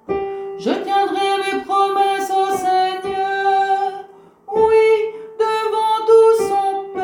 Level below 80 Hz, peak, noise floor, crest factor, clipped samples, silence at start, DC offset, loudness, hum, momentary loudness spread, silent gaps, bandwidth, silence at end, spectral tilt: -56 dBFS; -2 dBFS; -40 dBFS; 14 dB; under 0.1%; 0.1 s; under 0.1%; -17 LUFS; none; 11 LU; none; 18.5 kHz; 0 s; -3.5 dB/octave